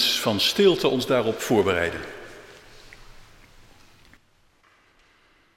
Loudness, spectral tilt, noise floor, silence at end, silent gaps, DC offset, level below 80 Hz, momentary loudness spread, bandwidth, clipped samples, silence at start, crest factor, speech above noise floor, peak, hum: -22 LUFS; -4 dB/octave; -61 dBFS; 2.35 s; none; under 0.1%; -54 dBFS; 22 LU; 16.5 kHz; under 0.1%; 0 s; 20 dB; 39 dB; -6 dBFS; none